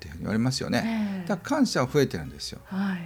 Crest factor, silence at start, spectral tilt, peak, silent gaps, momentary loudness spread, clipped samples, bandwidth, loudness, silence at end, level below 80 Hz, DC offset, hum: 16 dB; 0 s; -5.5 dB/octave; -10 dBFS; none; 10 LU; under 0.1%; over 20 kHz; -27 LUFS; 0 s; -52 dBFS; under 0.1%; none